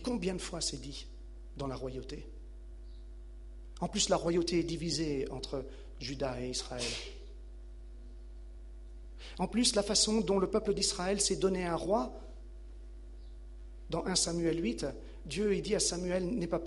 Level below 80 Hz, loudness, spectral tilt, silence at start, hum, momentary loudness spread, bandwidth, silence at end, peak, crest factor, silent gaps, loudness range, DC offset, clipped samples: -48 dBFS; -33 LUFS; -3.5 dB/octave; 0 s; none; 22 LU; 11.5 kHz; 0 s; -12 dBFS; 22 dB; none; 10 LU; under 0.1%; under 0.1%